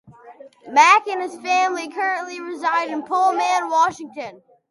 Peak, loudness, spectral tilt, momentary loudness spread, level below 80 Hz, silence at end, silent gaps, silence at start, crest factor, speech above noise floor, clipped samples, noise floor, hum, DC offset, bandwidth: -2 dBFS; -19 LUFS; -1.5 dB/octave; 17 LU; -70 dBFS; 0.35 s; none; 0.1 s; 20 dB; 25 dB; under 0.1%; -44 dBFS; none; under 0.1%; 11.5 kHz